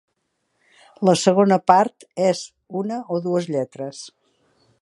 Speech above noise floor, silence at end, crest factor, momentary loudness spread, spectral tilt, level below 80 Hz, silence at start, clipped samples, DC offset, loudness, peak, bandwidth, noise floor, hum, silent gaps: 53 dB; 0.75 s; 20 dB; 16 LU; -5.5 dB/octave; -68 dBFS; 1 s; under 0.1%; under 0.1%; -20 LUFS; 0 dBFS; 11.5 kHz; -72 dBFS; none; none